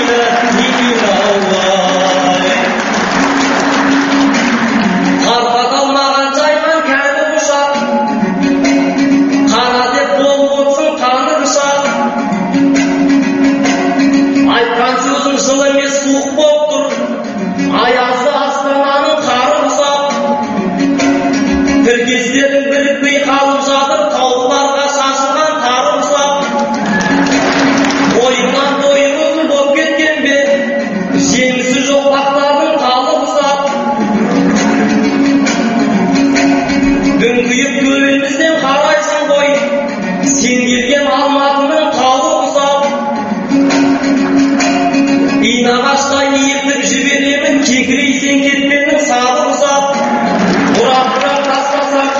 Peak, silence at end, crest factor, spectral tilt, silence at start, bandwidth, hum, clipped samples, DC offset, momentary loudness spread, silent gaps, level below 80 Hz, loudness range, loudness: 0 dBFS; 0 s; 10 dB; -2.5 dB/octave; 0 s; 8 kHz; none; under 0.1%; under 0.1%; 3 LU; none; -44 dBFS; 1 LU; -11 LUFS